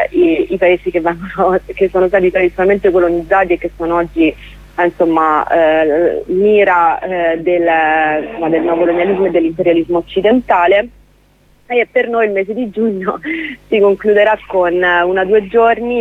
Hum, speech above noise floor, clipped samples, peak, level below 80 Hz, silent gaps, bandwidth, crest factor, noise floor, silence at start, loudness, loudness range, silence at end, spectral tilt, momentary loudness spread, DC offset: 50 Hz at -40 dBFS; 37 dB; under 0.1%; 0 dBFS; -40 dBFS; none; 4.2 kHz; 12 dB; -50 dBFS; 0 s; -13 LUFS; 2 LU; 0 s; -7.5 dB/octave; 6 LU; under 0.1%